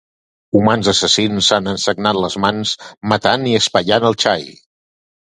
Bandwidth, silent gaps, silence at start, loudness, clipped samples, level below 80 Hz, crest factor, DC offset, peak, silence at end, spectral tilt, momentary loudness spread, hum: 11.5 kHz; 2.97-3.01 s; 0.55 s; -15 LUFS; under 0.1%; -48 dBFS; 16 dB; under 0.1%; 0 dBFS; 0.85 s; -3.5 dB/octave; 7 LU; none